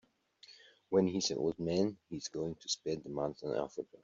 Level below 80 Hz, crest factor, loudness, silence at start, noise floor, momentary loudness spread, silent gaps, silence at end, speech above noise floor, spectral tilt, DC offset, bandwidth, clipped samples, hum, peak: -70 dBFS; 20 dB; -36 LUFS; 0.5 s; -62 dBFS; 11 LU; none; 0.1 s; 27 dB; -5.5 dB/octave; under 0.1%; 8 kHz; under 0.1%; none; -16 dBFS